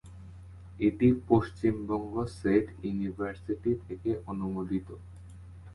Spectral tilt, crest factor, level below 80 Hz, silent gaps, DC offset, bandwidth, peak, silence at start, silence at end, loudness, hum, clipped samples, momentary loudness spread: -9 dB/octave; 22 dB; -50 dBFS; none; under 0.1%; 11.5 kHz; -10 dBFS; 0.05 s; 0 s; -30 LUFS; none; under 0.1%; 23 LU